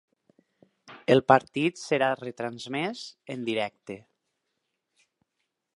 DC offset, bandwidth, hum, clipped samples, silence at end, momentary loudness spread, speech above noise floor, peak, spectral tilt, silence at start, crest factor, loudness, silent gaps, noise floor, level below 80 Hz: under 0.1%; 11.5 kHz; none; under 0.1%; 1.8 s; 19 LU; 55 dB; -4 dBFS; -5.5 dB/octave; 0.9 s; 26 dB; -27 LUFS; none; -81 dBFS; -70 dBFS